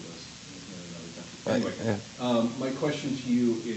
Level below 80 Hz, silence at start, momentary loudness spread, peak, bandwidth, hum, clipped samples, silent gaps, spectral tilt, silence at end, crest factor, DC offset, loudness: -66 dBFS; 0 s; 15 LU; -16 dBFS; 8.6 kHz; none; under 0.1%; none; -5.5 dB/octave; 0 s; 14 dB; under 0.1%; -29 LUFS